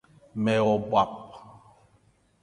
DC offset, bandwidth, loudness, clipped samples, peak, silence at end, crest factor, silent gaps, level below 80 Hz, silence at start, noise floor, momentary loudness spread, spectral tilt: under 0.1%; 10.5 kHz; -25 LUFS; under 0.1%; -8 dBFS; 0.95 s; 20 dB; none; -62 dBFS; 0.35 s; -64 dBFS; 19 LU; -7 dB/octave